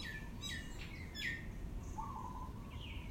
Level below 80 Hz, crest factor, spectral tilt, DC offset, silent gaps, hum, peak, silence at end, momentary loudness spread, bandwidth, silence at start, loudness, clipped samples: -50 dBFS; 16 dB; -4 dB/octave; under 0.1%; none; none; -30 dBFS; 0 s; 7 LU; 16 kHz; 0 s; -46 LUFS; under 0.1%